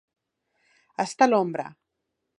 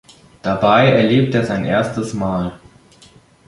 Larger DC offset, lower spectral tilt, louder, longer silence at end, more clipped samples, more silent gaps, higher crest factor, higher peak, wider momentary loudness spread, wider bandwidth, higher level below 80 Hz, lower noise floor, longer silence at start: neither; second, -5 dB/octave vs -7 dB/octave; second, -24 LUFS vs -16 LUFS; second, 0.7 s vs 0.9 s; neither; neither; first, 24 dB vs 16 dB; about the same, -4 dBFS vs -2 dBFS; first, 20 LU vs 11 LU; about the same, 11.5 kHz vs 11.5 kHz; second, -82 dBFS vs -46 dBFS; first, -81 dBFS vs -48 dBFS; first, 1 s vs 0.45 s